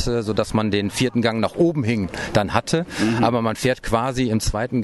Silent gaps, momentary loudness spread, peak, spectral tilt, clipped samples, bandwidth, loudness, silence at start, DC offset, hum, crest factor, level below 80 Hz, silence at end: none; 3 LU; -2 dBFS; -5.5 dB/octave; under 0.1%; 12.5 kHz; -21 LUFS; 0 s; under 0.1%; none; 18 dB; -38 dBFS; 0 s